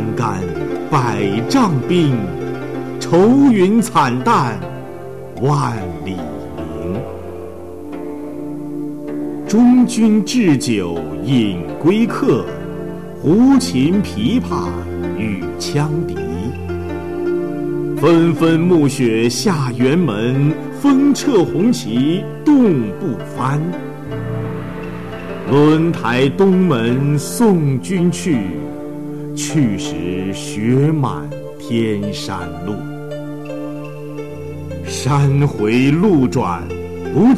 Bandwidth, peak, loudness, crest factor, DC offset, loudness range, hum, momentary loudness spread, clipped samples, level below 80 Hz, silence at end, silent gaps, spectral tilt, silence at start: 14 kHz; -6 dBFS; -16 LUFS; 10 dB; 1%; 8 LU; none; 15 LU; under 0.1%; -44 dBFS; 0 s; none; -6.5 dB/octave; 0 s